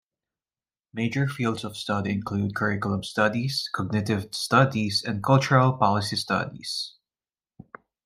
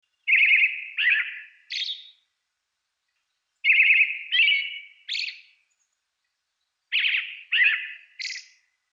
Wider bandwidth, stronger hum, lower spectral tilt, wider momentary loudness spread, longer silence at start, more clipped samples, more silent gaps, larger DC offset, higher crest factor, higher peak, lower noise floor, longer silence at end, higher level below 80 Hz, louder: first, 15 kHz vs 7.8 kHz; neither; first, -5.5 dB/octave vs 8.5 dB/octave; second, 10 LU vs 17 LU; first, 0.95 s vs 0.25 s; neither; neither; neither; about the same, 20 dB vs 18 dB; about the same, -6 dBFS vs -8 dBFS; first, under -90 dBFS vs -80 dBFS; first, 1.15 s vs 0.5 s; first, -62 dBFS vs under -90 dBFS; second, -25 LUFS vs -20 LUFS